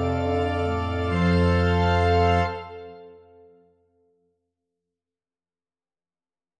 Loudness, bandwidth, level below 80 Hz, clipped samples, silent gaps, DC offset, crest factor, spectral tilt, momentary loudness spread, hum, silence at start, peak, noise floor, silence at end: -22 LUFS; 9 kHz; -40 dBFS; under 0.1%; none; under 0.1%; 16 dB; -7.5 dB/octave; 16 LU; none; 0 s; -8 dBFS; under -90 dBFS; 3.45 s